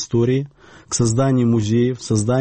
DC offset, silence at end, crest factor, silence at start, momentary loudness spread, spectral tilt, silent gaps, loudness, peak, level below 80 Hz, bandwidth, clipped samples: under 0.1%; 0 s; 12 dB; 0 s; 7 LU; -6 dB/octave; none; -18 LUFS; -6 dBFS; -48 dBFS; 8.8 kHz; under 0.1%